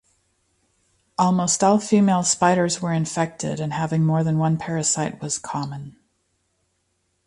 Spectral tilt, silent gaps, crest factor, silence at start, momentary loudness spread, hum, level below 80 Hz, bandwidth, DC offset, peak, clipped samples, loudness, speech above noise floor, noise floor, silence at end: -5 dB/octave; none; 18 dB; 1.2 s; 11 LU; none; -60 dBFS; 11.5 kHz; under 0.1%; -4 dBFS; under 0.1%; -21 LUFS; 50 dB; -71 dBFS; 1.35 s